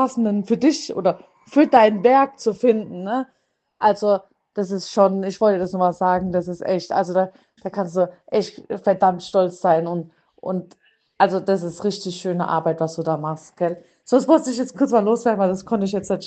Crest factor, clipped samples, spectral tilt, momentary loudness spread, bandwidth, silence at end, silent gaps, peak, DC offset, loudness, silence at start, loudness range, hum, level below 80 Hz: 20 dB; under 0.1%; -6 dB/octave; 11 LU; 8.8 kHz; 0 s; none; 0 dBFS; under 0.1%; -20 LUFS; 0 s; 4 LU; none; -60 dBFS